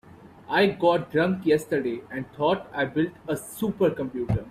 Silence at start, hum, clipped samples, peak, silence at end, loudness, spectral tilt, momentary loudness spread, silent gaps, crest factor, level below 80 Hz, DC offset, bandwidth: 0.25 s; none; under 0.1%; -8 dBFS; 0 s; -25 LUFS; -6 dB/octave; 9 LU; none; 16 dB; -52 dBFS; under 0.1%; 16 kHz